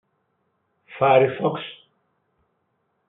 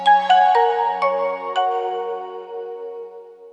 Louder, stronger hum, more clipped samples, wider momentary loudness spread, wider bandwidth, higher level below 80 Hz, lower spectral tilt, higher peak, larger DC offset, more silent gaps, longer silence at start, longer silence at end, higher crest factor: about the same, -20 LUFS vs -18 LUFS; neither; neither; about the same, 16 LU vs 18 LU; second, 4 kHz vs 9.4 kHz; first, -76 dBFS vs under -90 dBFS; first, -4.5 dB/octave vs -3 dB/octave; about the same, -4 dBFS vs -4 dBFS; neither; neither; first, 0.9 s vs 0 s; first, 1.35 s vs 0 s; first, 22 dB vs 16 dB